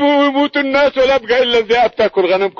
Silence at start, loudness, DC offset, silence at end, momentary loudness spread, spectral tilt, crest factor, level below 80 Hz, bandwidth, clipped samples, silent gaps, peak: 0 s; -13 LUFS; under 0.1%; 0 s; 2 LU; -4.5 dB/octave; 10 dB; -46 dBFS; 7.2 kHz; under 0.1%; none; -4 dBFS